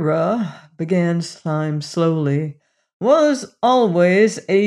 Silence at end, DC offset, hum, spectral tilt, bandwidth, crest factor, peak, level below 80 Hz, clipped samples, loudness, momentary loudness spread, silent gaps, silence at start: 0 s; under 0.1%; none; -6.5 dB/octave; 11 kHz; 14 dB; -4 dBFS; -70 dBFS; under 0.1%; -18 LUFS; 9 LU; 2.93-3.00 s; 0 s